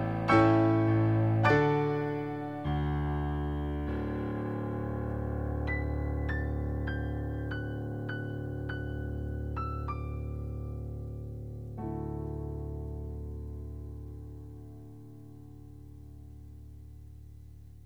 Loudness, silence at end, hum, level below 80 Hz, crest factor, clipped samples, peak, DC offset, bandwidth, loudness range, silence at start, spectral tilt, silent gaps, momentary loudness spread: -32 LUFS; 0 s; none; -42 dBFS; 22 dB; under 0.1%; -10 dBFS; 0.2%; 6.6 kHz; 17 LU; 0 s; -9 dB/octave; none; 24 LU